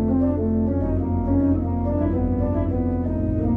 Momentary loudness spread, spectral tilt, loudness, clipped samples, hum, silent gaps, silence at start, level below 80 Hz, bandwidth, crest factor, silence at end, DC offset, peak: 3 LU; -13 dB/octave; -22 LUFS; under 0.1%; none; none; 0 s; -30 dBFS; 2.6 kHz; 12 dB; 0 s; under 0.1%; -10 dBFS